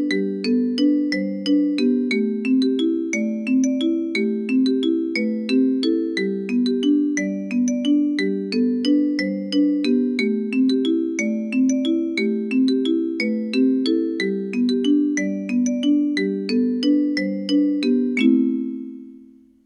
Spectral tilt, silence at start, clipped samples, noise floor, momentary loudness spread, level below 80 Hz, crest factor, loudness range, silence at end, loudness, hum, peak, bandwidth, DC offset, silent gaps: -5 dB/octave; 0 s; under 0.1%; -48 dBFS; 4 LU; -72 dBFS; 14 dB; 1 LU; 0.4 s; -20 LUFS; none; -6 dBFS; 10.5 kHz; under 0.1%; none